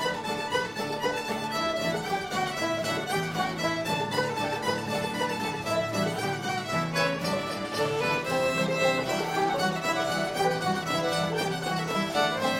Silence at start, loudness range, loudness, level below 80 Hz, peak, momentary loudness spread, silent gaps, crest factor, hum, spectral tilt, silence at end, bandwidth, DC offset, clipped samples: 0 s; 2 LU; -28 LUFS; -58 dBFS; -12 dBFS; 4 LU; none; 16 dB; none; -4 dB/octave; 0 s; 16.5 kHz; under 0.1%; under 0.1%